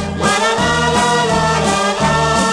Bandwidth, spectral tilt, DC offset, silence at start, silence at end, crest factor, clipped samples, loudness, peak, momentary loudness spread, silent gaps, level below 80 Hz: 15.5 kHz; -3.5 dB/octave; under 0.1%; 0 s; 0 s; 14 dB; under 0.1%; -14 LUFS; 0 dBFS; 1 LU; none; -34 dBFS